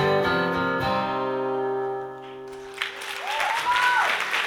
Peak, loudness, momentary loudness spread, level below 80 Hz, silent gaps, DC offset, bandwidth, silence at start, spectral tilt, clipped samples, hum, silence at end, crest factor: -10 dBFS; -24 LUFS; 16 LU; -56 dBFS; none; under 0.1%; 18 kHz; 0 s; -4 dB/octave; under 0.1%; none; 0 s; 16 dB